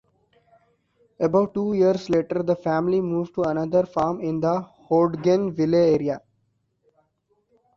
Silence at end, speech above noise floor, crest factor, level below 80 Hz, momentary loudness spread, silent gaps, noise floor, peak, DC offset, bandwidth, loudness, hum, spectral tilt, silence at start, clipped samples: 1.6 s; 49 dB; 16 dB; -58 dBFS; 5 LU; none; -70 dBFS; -6 dBFS; under 0.1%; 7.2 kHz; -22 LUFS; none; -8 dB/octave; 1.2 s; under 0.1%